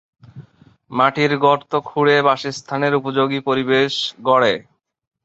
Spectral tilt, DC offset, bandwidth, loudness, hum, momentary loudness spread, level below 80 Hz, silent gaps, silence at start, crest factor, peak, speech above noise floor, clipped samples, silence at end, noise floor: -5 dB/octave; under 0.1%; 8 kHz; -18 LUFS; none; 7 LU; -62 dBFS; none; 0.35 s; 18 dB; -2 dBFS; 33 dB; under 0.1%; 0.65 s; -50 dBFS